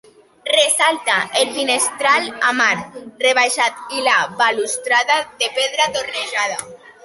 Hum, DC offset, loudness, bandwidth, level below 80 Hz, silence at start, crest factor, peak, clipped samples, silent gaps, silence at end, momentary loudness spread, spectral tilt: none; under 0.1%; -17 LUFS; 12 kHz; -66 dBFS; 0.45 s; 16 dB; -2 dBFS; under 0.1%; none; 0.15 s; 7 LU; 0 dB/octave